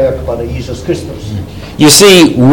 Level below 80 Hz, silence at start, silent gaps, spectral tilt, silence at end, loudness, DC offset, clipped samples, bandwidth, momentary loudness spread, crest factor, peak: -28 dBFS; 0 s; none; -4 dB/octave; 0 s; -7 LUFS; under 0.1%; 3%; over 20 kHz; 19 LU; 8 dB; 0 dBFS